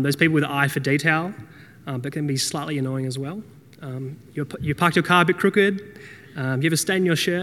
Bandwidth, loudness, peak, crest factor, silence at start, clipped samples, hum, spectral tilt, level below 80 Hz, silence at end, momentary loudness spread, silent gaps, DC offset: 18 kHz; -22 LUFS; 0 dBFS; 22 dB; 0 s; under 0.1%; none; -5 dB/octave; -60 dBFS; 0 s; 18 LU; none; under 0.1%